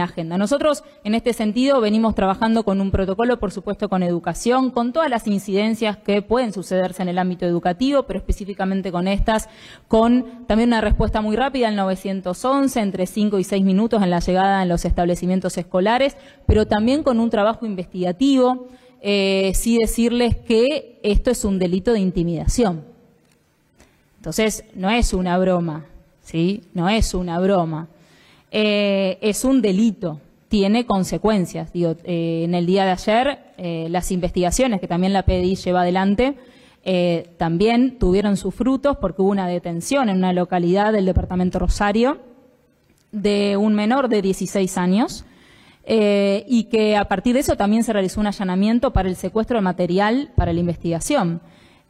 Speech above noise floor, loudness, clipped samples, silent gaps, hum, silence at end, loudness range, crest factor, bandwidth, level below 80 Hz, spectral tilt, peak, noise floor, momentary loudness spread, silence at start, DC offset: 41 dB; -20 LUFS; under 0.1%; none; none; 0.5 s; 2 LU; 14 dB; 14.5 kHz; -32 dBFS; -6 dB/octave; -4 dBFS; -60 dBFS; 6 LU; 0 s; under 0.1%